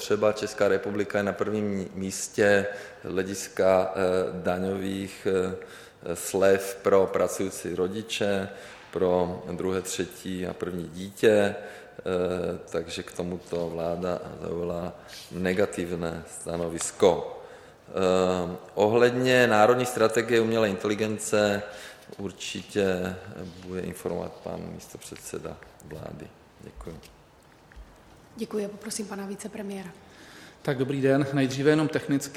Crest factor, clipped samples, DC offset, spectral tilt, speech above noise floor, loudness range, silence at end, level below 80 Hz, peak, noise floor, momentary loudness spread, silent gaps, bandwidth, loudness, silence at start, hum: 22 dB; under 0.1%; under 0.1%; -5 dB/octave; 28 dB; 14 LU; 0 s; -58 dBFS; -6 dBFS; -55 dBFS; 18 LU; none; 16 kHz; -27 LUFS; 0 s; none